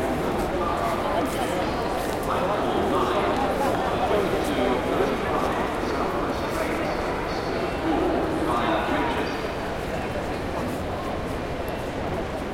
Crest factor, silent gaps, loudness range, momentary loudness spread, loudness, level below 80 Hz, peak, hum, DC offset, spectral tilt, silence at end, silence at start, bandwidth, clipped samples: 16 dB; none; 3 LU; 6 LU; -25 LUFS; -40 dBFS; -10 dBFS; none; under 0.1%; -5.5 dB/octave; 0 s; 0 s; 16.5 kHz; under 0.1%